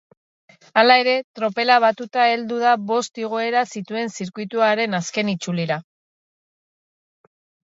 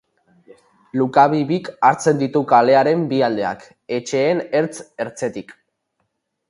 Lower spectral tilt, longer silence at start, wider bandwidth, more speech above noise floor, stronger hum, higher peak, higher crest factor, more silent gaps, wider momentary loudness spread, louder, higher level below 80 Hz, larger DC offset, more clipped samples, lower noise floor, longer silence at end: second, -4 dB/octave vs -6 dB/octave; second, 0.75 s vs 0.95 s; second, 8 kHz vs 11.5 kHz; first, over 70 dB vs 55 dB; neither; about the same, 0 dBFS vs 0 dBFS; about the same, 20 dB vs 18 dB; first, 1.24-1.34 s vs none; about the same, 11 LU vs 13 LU; about the same, -20 LUFS vs -18 LUFS; second, -74 dBFS vs -64 dBFS; neither; neither; first, under -90 dBFS vs -72 dBFS; first, 1.85 s vs 1 s